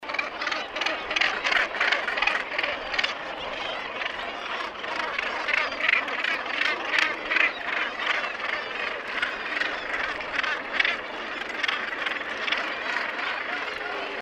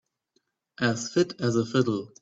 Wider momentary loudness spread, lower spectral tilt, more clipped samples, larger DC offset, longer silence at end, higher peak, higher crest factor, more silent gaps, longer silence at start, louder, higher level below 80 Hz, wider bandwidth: first, 8 LU vs 4 LU; second, -1.5 dB/octave vs -5.5 dB/octave; neither; neither; second, 0 s vs 0.15 s; first, -4 dBFS vs -10 dBFS; first, 24 dB vs 18 dB; neither; second, 0 s vs 0.8 s; about the same, -26 LUFS vs -26 LUFS; first, -60 dBFS vs -66 dBFS; first, 14.5 kHz vs 8 kHz